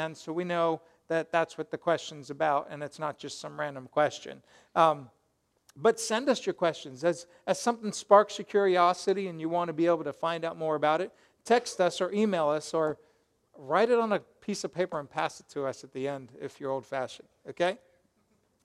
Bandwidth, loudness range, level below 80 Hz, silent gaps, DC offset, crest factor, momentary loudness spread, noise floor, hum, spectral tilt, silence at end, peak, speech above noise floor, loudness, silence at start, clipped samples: 13.5 kHz; 7 LU; -76 dBFS; none; under 0.1%; 24 dB; 13 LU; -74 dBFS; none; -4.5 dB/octave; 0.9 s; -6 dBFS; 45 dB; -29 LUFS; 0 s; under 0.1%